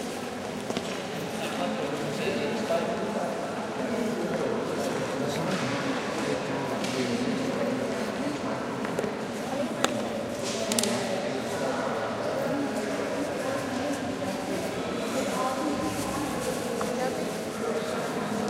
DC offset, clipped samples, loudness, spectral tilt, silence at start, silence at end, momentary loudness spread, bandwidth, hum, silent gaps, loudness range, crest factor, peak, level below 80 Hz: under 0.1%; under 0.1%; -30 LUFS; -4.5 dB/octave; 0 s; 0 s; 4 LU; 16 kHz; none; none; 1 LU; 26 dB; -4 dBFS; -60 dBFS